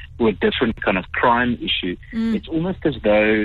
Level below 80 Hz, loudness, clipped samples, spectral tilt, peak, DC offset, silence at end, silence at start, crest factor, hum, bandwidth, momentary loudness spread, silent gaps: -40 dBFS; -20 LUFS; under 0.1%; -7.5 dB/octave; -4 dBFS; under 0.1%; 0 s; 0 s; 14 dB; none; 4.8 kHz; 6 LU; none